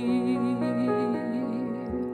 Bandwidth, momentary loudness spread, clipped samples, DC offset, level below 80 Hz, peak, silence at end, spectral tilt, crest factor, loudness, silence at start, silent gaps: 9.6 kHz; 6 LU; under 0.1%; under 0.1%; -56 dBFS; -14 dBFS; 0 s; -8 dB/octave; 12 dB; -28 LUFS; 0 s; none